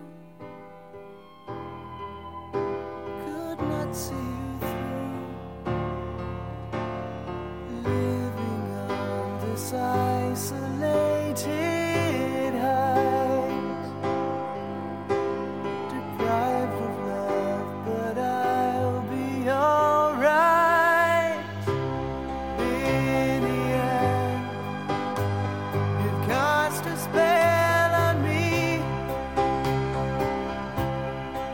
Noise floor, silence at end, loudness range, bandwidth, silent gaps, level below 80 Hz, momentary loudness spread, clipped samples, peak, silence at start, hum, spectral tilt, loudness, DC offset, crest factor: -46 dBFS; 0 s; 10 LU; 17 kHz; none; -48 dBFS; 14 LU; under 0.1%; -10 dBFS; 0 s; none; -6 dB/octave; -26 LUFS; 0.2%; 16 dB